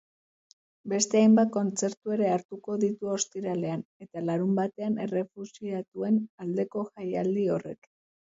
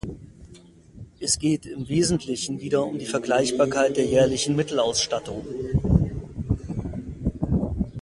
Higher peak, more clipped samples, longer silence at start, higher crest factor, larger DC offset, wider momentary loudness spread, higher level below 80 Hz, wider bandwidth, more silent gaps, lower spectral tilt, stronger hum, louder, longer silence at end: second, -8 dBFS vs -4 dBFS; neither; first, 0.85 s vs 0.05 s; about the same, 20 dB vs 22 dB; neither; about the same, 13 LU vs 11 LU; second, -74 dBFS vs -38 dBFS; second, 8 kHz vs 11.5 kHz; first, 1.97-2.01 s, 2.45-2.49 s, 3.85-4.00 s, 5.88-5.92 s, 6.30-6.38 s vs none; about the same, -5.5 dB/octave vs -5 dB/octave; neither; second, -28 LUFS vs -24 LUFS; first, 0.55 s vs 0 s